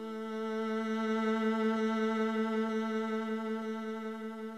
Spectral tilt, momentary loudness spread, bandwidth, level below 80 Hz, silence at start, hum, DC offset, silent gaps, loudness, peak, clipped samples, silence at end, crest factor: -6 dB/octave; 8 LU; 9.2 kHz; -80 dBFS; 0 s; none; under 0.1%; none; -34 LUFS; -22 dBFS; under 0.1%; 0 s; 12 dB